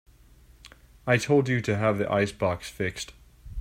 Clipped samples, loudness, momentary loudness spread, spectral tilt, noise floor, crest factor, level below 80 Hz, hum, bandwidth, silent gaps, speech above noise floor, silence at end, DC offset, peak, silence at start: under 0.1%; -26 LUFS; 16 LU; -6 dB/octave; -55 dBFS; 18 dB; -52 dBFS; none; 16 kHz; none; 29 dB; 0 s; under 0.1%; -8 dBFS; 0.65 s